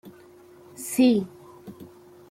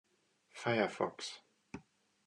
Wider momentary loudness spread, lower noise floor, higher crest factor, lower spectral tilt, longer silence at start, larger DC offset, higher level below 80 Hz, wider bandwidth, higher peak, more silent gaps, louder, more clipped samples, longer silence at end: first, 26 LU vs 20 LU; second, -50 dBFS vs -75 dBFS; about the same, 18 dB vs 22 dB; about the same, -5 dB/octave vs -4.5 dB/octave; second, 0.05 s vs 0.55 s; neither; first, -68 dBFS vs -78 dBFS; first, 16 kHz vs 11.5 kHz; first, -8 dBFS vs -18 dBFS; neither; first, -22 LUFS vs -37 LUFS; neither; about the same, 0.45 s vs 0.45 s